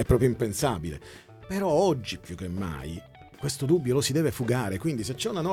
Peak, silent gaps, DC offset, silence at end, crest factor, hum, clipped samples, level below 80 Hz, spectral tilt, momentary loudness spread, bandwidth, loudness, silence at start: -8 dBFS; none; under 0.1%; 0 s; 18 dB; none; under 0.1%; -44 dBFS; -5.5 dB/octave; 14 LU; 16.5 kHz; -28 LUFS; 0 s